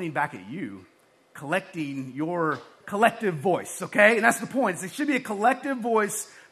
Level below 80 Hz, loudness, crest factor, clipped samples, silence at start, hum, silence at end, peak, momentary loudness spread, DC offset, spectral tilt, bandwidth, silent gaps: -76 dBFS; -25 LUFS; 24 dB; under 0.1%; 0 s; none; 0.1 s; -2 dBFS; 15 LU; under 0.1%; -4.5 dB/octave; 14.5 kHz; none